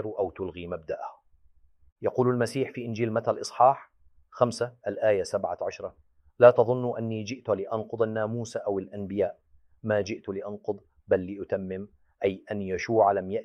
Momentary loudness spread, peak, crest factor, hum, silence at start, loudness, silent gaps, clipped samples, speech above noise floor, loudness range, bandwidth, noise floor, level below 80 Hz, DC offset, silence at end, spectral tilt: 14 LU; -4 dBFS; 24 dB; none; 0 s; -28 LUFS; 1.92-1.96 s; under 0.1%; 33 dB; 6 LU; 12 kHz; -60 dBFS; -64 dBFS; under 0.1%; 0 s; -6.5 dB/octave